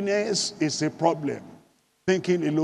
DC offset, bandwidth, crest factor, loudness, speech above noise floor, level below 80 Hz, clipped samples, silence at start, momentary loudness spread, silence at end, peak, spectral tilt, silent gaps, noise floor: under 0.1%; 11.5 kHz; 18 dB; -25 LUFS; 36 dB; -68 dBFS; under 0.1%; 0 s; 9 LU; 0 s; -8 dBFS; -4.5 dB/octave; none; -61 dBFS